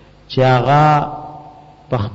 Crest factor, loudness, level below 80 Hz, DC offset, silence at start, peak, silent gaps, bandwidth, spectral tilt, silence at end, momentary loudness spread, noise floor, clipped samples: 12 dB; -15 LUFS; -46 dBFS; under 0.1%; 0.3 s; -4 dBFS; none; 7.8 kHz; -7.5 dB/octave; 0 s; 17 LU; -40 dBFS; under 0.1%